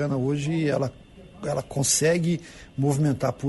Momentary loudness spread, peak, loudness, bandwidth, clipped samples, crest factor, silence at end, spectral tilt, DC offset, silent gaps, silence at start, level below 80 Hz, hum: 11 LU; -10 dBFS; -25 LUFS; 11.5 kHz; under 0.1%; 16 dB; 0 s; -5 dB/octave; under 0.1%; none; 0 s; -52 dBFS; none